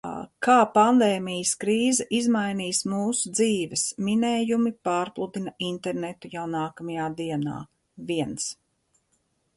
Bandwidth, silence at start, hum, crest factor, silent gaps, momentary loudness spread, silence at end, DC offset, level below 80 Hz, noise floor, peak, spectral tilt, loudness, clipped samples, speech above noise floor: 11.5 kHz; 0.05 s; none; 20 dB; none; 13 LU; 1.05 s; under 0.1%; -66 dBFS; -71 dBFS; -6 dBFS; -4 dB/octave; -25 LUFS; under 0.1%; 47 dB